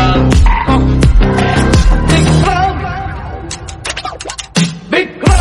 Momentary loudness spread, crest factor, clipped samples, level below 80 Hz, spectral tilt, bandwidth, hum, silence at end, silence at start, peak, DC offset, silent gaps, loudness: 13 LU; 10 dB; under 0.1%; -14 dBFS; -5.5 dB/octave; 11.5 kHz; none; 0 s; 0 s; 0 dBFS; under 0.1%; none; -12 LUFS